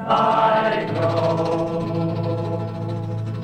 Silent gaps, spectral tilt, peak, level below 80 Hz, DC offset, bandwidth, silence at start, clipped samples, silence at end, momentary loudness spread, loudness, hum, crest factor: none; -7.5 dB/octave; -6 dBFS; -52 dBFS; under 0.1%; 9.2 kHz; 0 s; under 0.1%; 0 s; 10 LU; -21 LUFS; none; 16 dB